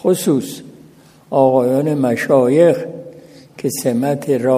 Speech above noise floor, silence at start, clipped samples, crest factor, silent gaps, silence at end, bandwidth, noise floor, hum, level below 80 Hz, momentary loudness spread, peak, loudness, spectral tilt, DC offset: 30 dB; 0.05 s; under 0.1%; 16 dB; none; 0 s; 15.5 kHz; -45 dBFS; none; -62 dBFS; 15 LU; 0 dBFS; -15 LUFS; -6 dB/octave; under 0.1%